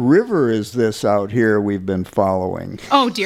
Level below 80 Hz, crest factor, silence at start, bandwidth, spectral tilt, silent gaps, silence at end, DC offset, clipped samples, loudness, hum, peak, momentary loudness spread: -52 dBFS; 16 dB; 0 s; 15.5 kHz; -6 dB/octave; none; 0 s; under 0.1%; under 0.1%; -18 LUFS; none; -2 dBFS; 7 LU